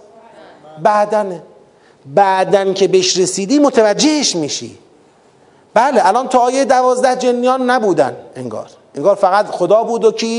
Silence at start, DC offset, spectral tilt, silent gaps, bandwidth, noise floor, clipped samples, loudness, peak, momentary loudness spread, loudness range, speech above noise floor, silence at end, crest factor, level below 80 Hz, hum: 0.65 s; under 0.1%; -3.5 dB/octave; none; 11 kHz; -48 dBFS; under 0.1%; -13 LUFS; 0 dBFS; 12 LU; 1 LU; 35 dB; 0 s; 14 dB; -64 dBFS; none